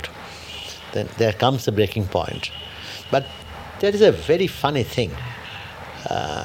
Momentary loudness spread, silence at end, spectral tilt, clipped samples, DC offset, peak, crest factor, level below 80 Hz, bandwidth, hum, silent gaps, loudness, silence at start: 17 LU; 0 s; -5.5 dB/octave; under 0.1%; under 0.1%; -2 dBFS; 20 dB; -46 dBFS; 17 kHz; none; none; -22 LUFS; 0 s